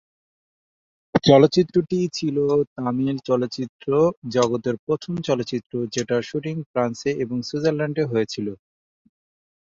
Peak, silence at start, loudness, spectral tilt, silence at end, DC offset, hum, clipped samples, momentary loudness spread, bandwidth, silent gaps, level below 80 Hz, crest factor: -2 dBFS; 1.15 s; -22 LUFS; -6 dB/octave; 1.05 s; under 0.1%; none; under 0.1%; 10 LU; 7.8 kHz; 2.67-2.76 s, 3.69-3.79 s, 4.17-4.22 s, 4.79-4.87 s, 6.66-6.74 s; -58 dBFS; 20 dB